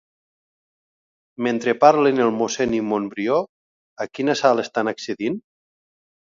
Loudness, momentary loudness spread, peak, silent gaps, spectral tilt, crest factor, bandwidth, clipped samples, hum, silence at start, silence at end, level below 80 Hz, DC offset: -20 LUFS; 12 LU; 0 dBFS; 3.49-3.96 s; -4.5 dB/octave; 22 dB; 7.6 kHz; under 0.1%; none; 1.4 s; 0.9 s; -60 dBFS; under 0.1%